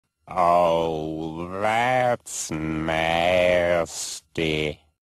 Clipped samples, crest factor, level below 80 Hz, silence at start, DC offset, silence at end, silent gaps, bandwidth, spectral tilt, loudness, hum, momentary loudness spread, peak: under 0.1%; 16 dB; -48 dBFS; 0.25 s; under 0.1%; 0.3 s; none; 13 kHz; -4 dB/octave; -23 LUFS; none; 11 LU; -8 dBFS